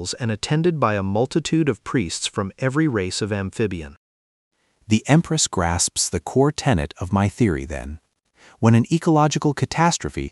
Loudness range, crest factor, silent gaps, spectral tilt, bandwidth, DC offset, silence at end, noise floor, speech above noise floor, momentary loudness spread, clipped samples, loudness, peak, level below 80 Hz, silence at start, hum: 3 LU; 18 dB; 3.97-4.51 s; -5 dB/octave; 12 kHz; under 0.1%; 0 s; -54 dBFS; 33 dB; 8 LU; under 0.1%; -21 LUFS; -4 dBFS; -42 dBFS; 0 s; none